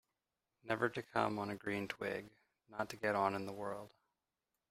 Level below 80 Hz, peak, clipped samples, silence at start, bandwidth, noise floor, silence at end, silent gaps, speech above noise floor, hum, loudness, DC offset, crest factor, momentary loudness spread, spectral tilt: -76 dBFS; -18 dBFS; under 0.1%; 0.65 s; 16 kHz; under -90 dBFS; 0.85 s; none; over 50 dB; none; -40 LUFS; under 0.1%; 24 dB; 14 LU; -5.5 dB/octave